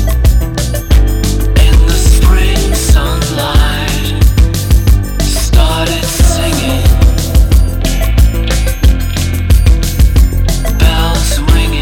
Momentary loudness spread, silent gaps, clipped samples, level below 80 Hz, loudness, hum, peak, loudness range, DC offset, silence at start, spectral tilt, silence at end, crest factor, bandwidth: 5 LU; none; 0.2%; -10 dBFS; -11 LUFS; none; 0 dBFS; 1 LU; under 0.1%; 0 s; -5 dB/octave; 0 s; 8 dB; 17.5 kHz